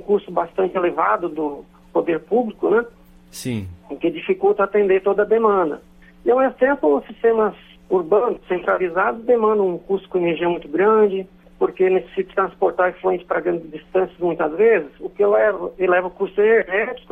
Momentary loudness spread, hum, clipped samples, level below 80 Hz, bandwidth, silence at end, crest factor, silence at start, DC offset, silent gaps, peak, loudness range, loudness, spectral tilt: 9 LU; none; under 0.1%; -54 dBFS; 13 kHz; 0.15 s; 16 dB; 0 s; under 0.1%; none; -4 dBFS; 3 LU; -19 LUFS; -6.5 dB/octave